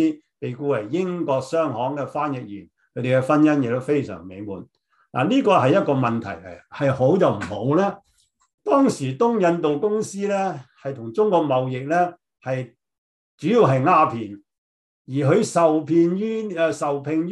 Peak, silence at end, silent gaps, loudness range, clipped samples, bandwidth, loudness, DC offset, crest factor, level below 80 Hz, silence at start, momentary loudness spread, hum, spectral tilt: -4 dBFS; 0 s; 8.54-8.58 s, 12.98-13.38 s, 14.58-15.05 s; 3 LU; under 0.1%; 12 kHz; -21 LUFS; under 0.1%; 18 dB; -64 dBFS; 0 s; 16 LU; none; -7 dB/octave